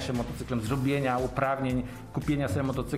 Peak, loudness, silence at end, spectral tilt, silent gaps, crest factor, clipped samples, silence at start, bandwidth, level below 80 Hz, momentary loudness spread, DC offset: -12 dBFS; -30 LUFS; 0 s; -6.5 dB/octave; none; 16 dB; under 0.1%; 0 s; 16 kHz; -44 dBFS; 6 LU; 0.1%